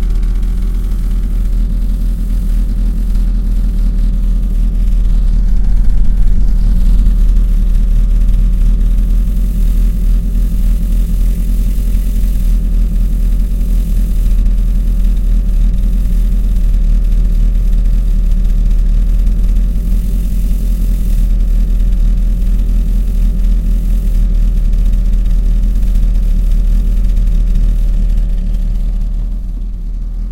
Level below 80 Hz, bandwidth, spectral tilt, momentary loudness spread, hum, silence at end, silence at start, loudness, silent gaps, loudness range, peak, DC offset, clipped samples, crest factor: -10 dBFS; 3.9 kHz; -7.5 dB/octave; 3 LU; none; 0 s; 0 s; -16 LUFS; none; 2 LU; 0 dBFS; under 0.1%; under 0.1%; 10 dB